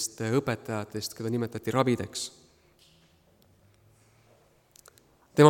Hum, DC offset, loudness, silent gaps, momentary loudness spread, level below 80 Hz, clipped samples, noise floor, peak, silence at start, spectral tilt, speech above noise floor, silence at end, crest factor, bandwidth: none; under 0.1%; -30 LUFS; none; 9 LU; -66 dBFS; under 0.1%; -62 dBFS; -4 dBFS; 0 s; -5.5 dB/octave; 32 dB; 0 s; 26 dB; 18 kHz